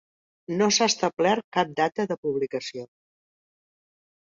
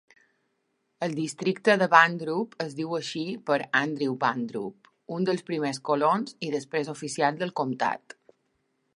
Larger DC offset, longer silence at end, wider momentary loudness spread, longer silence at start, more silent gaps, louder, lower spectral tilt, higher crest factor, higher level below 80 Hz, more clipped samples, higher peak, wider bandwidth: neither; first, 1.4 s vs 1 s; about the same, 12 LU vs 12 LU; second, 0.5 s vs 1 s; first, 1.44-1.52 s, 2.18-2.23 s vs none; about the same, -25 LUFS vs -26 LUFS; second, -3 dB/octave vs -5 dB/octave; second, 20 dB vs 26 dB; first, -70 dBFS vs -78 dBFS; neither; second, -8 dBFS vs -2 dBFS; second, 7.8 kHz vs 11.5 kHz